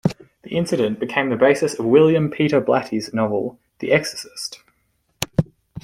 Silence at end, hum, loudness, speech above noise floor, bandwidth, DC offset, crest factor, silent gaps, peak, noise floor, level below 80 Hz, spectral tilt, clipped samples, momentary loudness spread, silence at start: 0.05 s; none; -20 LUFS; 48 dB; 16 kHz; under 0.1%; 18 dB; none; -2 dBFS; -67 dBFS; -54 dBFS; -5.5 dB/octave; under 0.1%; 15 LU; 0.05 s